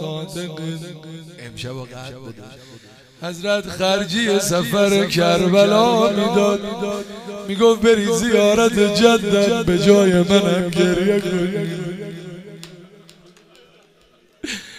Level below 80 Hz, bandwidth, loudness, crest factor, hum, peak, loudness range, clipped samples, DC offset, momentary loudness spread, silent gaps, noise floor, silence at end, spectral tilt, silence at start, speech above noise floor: -48 dBFS; 15.5 kHz; -17 LUFS; 18 dB; none; 0 dBFS; 14 LU; under 0.1%; under 0.1%; 21 LU; none; -55 dBFS; 0 s; -5 dB/octave; 0 s; 37 dB